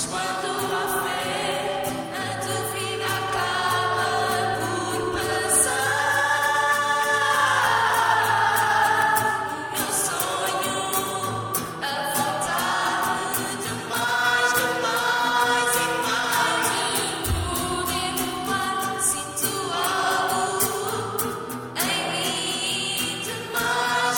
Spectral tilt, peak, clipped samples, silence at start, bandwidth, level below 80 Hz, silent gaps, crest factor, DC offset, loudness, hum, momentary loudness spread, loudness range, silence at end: -2 dB/octave; -6 dBFS; under 0.1%; 0 s; 19.5 kHz; -48 dBFS; none; 18 dB; under 0.1%; -23 LUFS; none; 7 LU; 5 LU; 0 s